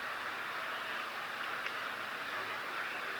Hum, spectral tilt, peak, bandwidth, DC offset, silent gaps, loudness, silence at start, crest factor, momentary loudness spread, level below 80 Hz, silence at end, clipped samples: none; -1.5 dB/octave; -24 dBFS; over 20 kHz; under 0.1%; none; -38 LUFS; 0 s; 16 dB; 1 LU; -78 dBFS; 0 s; under 0.1%